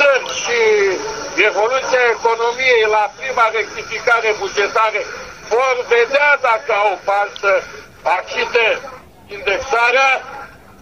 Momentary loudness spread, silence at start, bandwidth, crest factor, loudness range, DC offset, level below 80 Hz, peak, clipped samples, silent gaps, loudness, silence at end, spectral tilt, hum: 10 LU; 0 s; 11 kHz; 16 dB; 2 LU; 0.2%; -52 dBFS; 0 dBFS; under 0.1%; none; -15 LUFS; 0.25 s; -1.5 dB/octave; none